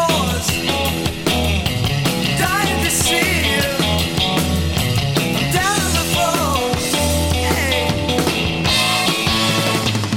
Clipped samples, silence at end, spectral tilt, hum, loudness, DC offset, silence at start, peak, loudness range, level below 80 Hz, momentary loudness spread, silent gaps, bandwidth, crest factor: under 0.1%; 0 s; -3.5 dB/octave; none; -17 LUFS; under 0.1%; 0 s; -2 dBFS; 1 LU; -30 dBFS; 3 LU; none; 17.5 kHz; 16 dB